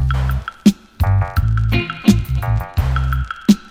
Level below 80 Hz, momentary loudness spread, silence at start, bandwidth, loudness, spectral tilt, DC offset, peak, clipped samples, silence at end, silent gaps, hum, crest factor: -22 dBFS; 4 LU; 0 s; 16 kHz; -18 LUFS; -6.5 dB/octave; under 0.1%; 0 dBFS; under 0.1%; 0 s; none; none; 16 dB